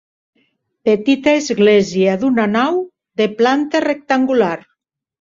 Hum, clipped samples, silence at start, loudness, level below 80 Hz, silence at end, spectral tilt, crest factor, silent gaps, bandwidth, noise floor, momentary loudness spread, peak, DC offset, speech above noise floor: none; under 0.1%; 0.85 s; -15 LUFS; -58 dBFS; 0.6 s; -5.5 dB/octave; 16 dB; none; 7.6 kHz; -63 dBFS; 7 LU; -2 dBFS; under 0.1%; 49 dB